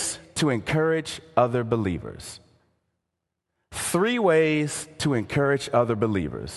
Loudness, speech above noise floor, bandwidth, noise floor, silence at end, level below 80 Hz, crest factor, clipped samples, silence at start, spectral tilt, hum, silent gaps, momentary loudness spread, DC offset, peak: -24 LUFS; 59 dB; 12.5 kHz; -82 dBFS; 0 s; -50 dBFS; 20 dB; under 0.1%; 0 s; -5 dB/octave; none; none; 10 LU; under 0.1%; -4 dBFS